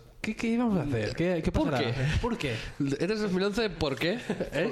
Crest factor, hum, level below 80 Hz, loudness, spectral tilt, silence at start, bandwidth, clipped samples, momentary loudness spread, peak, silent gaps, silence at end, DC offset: 16 dB; none; -42 dBFS; -29 LUFS; -6 dB/octave; 0 s; 14 kHz; under 0.1%; 5 LU; -14 dBFS; none; 0 s; under 0.1%